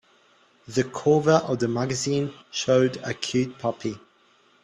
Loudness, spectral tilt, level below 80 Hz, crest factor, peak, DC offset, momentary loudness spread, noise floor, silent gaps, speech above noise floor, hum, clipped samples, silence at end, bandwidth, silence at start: -24 LUFS; -5 dB/octave; -62 dBFS; 20 dB; -6 dBFS; under 0.1%; 9 LU; -60 dBFS; none; 37 dB; none; under 0.1%; 0.65 s; 11.5 kHz; 0.7 s